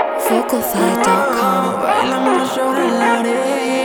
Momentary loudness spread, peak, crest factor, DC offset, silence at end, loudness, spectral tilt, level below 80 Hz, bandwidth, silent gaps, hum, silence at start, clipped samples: 3 LU; -2 dBFS; 14 dB; under 0.1%; 0 s; -16 LUFS; -4 dB/octave; -56 dBFS; over 20 kHz; none; none; 0 s; under 0.1%